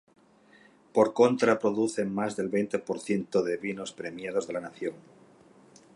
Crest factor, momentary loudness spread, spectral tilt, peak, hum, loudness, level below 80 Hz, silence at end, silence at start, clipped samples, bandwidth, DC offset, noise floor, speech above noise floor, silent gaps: 22 dB; 14 LU; -5.5 dB/octave; -8 dBFS; none; -28 LUFS; -72 dBFS; 0.95 s; 0.95 s; under 0.1%; 11 kHz; under 0.1%; -59 dBFS; 31 dB; none